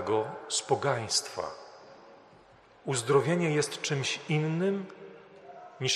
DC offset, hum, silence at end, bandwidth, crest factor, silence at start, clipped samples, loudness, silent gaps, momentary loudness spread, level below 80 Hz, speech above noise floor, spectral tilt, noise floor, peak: under 0.1%; none; 0 s; 13 kHz; 22 dB; 0 s; under 0.1%; -30 LUFS; none; 23 LU; -72 dBFS; 28 dB; -4 dB/octave; -57 dBFS; -10 dBFS